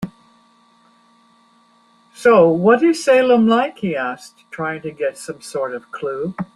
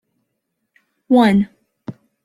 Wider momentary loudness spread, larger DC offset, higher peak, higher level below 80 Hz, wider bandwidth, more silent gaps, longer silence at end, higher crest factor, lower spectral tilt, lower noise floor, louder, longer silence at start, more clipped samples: second, 15 LU vs 23 LU; neither; about the same, -2 dBFS vs -2 dBFS; about the same, -60 dBFS vs -56 dBFS; about the same, 12 kHz vs 12 kHz; neither; second, 0.1 s vs 0.35 s; about the same, 18 dB vs 18 dB; second, -5.5 dB/octave vs -7.5 dB/octave; second, -55 dBFS vs -74 dBFS; about the same, -17 LUFS vs -15 LUFS; second, 0 s vs 1.1 s; neither